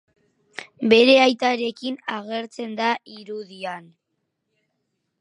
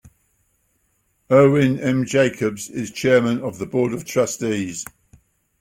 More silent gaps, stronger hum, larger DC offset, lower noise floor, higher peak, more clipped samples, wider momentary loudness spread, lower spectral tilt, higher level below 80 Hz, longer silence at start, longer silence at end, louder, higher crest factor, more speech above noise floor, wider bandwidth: neither; neither; neither; first, -76 dBFS vs -66 dBFS; about the same, -2 dBFS vs -2 dBFS; neither; first, 22 LU vs 13 LU; second, -4 dB/octave vs -5.5 dB/octave; second, -70 dBFS vs -56 dBFS; first, 0.6 s vs 0.05 s; first, 1.4 s vs 0.75 s; about the same, -20 LUFS vs -19 LUFS; about the same, 22 dB vs 18 dB; first, 55 dB vs 48 dB; second, 10.5 kHz vs 16.5 kHz